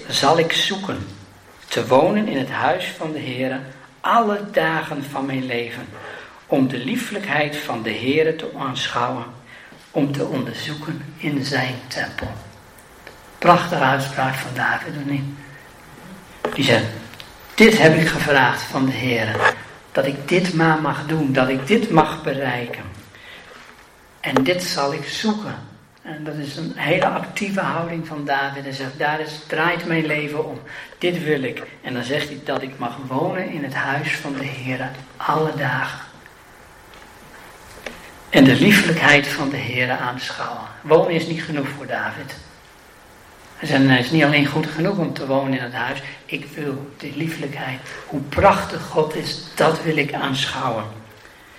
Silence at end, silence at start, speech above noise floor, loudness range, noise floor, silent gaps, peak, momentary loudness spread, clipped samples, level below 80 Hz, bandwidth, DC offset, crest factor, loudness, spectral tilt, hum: 0 s; 0 s; 27 dB; 8 LU; -47 dBFS; none; 0 dBFS; 17 LU; under 0.1%; -52 dBFS; 16 kHz; under 0.1%; 22 dB; -20 LUFS; -5 dB/octave; none